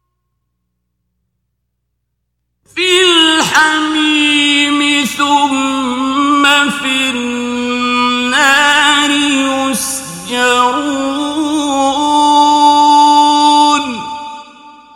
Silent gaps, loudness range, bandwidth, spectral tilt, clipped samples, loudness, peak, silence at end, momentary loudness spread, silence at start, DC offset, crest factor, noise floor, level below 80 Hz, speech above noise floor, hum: none; 3 LU; 17 kHz; -1.5 dB/octave; 0.2%; -10 LUFS; 0 dBFS; 0.25 s; 9 LU; 2.75 s; under 0.1%; 12 dB; -70 dBFS; -54 dBFS; 58 dB; 60 Hz at -55 dBFS